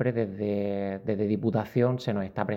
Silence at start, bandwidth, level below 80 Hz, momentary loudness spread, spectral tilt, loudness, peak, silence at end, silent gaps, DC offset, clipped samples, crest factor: 0 s; 16 kHz; -62 dBFS; 5 LU; -9 dB/octave; -28 LUFS; -10 dBFS; 0 s; none; under 0.1%; under 0.1%; 18 dB